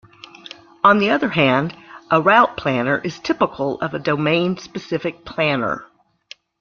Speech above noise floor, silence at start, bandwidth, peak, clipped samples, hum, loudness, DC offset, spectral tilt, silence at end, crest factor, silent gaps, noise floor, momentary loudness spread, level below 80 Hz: 28 dB; 0.85 s; 7.2 kHz; -2 dBFS; under 0.1%; none; -18 LUFS; under 0.1%; -6 dB/octave; 0.75 s; 18 dB; none; -46 dBFS; 15 LU; -56 dBFS